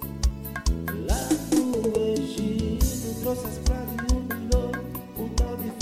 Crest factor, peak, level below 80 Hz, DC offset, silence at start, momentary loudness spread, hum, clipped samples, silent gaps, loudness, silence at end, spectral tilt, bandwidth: 16 dB; -10 dBFS; -30 dBFS; under 0.1%; 0 s; 6 LU; none; under 0.1%; none; -27 LUFS; 0 s; -5.5 dB/octave; 16 kHz